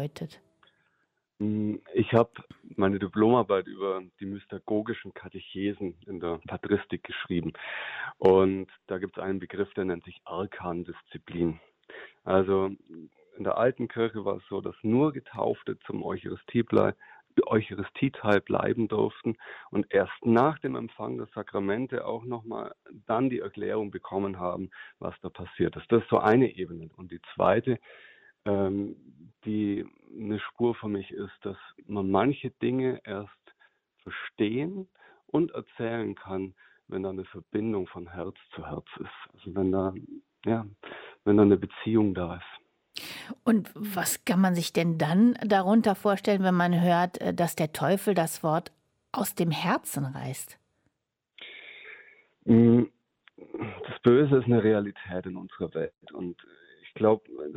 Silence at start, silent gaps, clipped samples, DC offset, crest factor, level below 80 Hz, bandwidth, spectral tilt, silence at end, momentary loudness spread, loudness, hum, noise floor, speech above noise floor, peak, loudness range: 0 s; none; under 0.1%; under 0.1%; 20 dB; -62 dBFS; 16 kHz; -6.5 dB/octave; 0 s; 18 LU; -28 LUFS; none; -82 dBFS; 54 dB; -8 dBFS; 9 LU